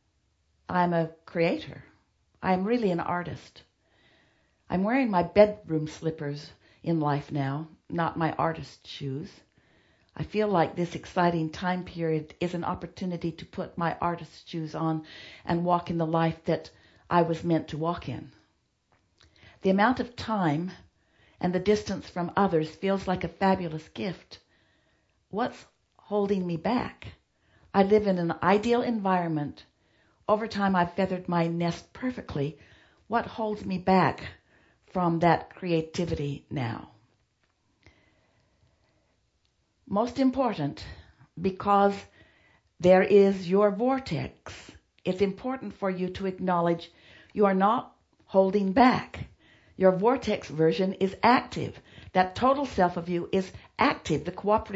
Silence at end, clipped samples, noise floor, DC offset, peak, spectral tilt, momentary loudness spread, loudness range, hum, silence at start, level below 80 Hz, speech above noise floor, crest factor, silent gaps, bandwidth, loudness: 0 s; under 0.1%; -72 dBFS; under 0.1%; -4 dBFS; -7 dB/octave; 15 LU; 7 LU; none; 0.7 s; -56 dBFS; 45 dB; 24 dB; none; 8 kHz; -27 LUFS